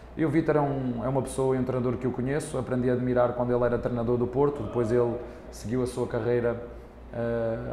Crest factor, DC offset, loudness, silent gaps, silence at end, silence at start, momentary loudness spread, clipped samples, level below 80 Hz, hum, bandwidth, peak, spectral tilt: 16 dB; under 0.1%; -27 LUFS; none; 0 s; 0 s; 8 LU; under 0.1%; -46 dBFS; none; 13.5 kHz; -10 dBFS; -7.5 dB/octave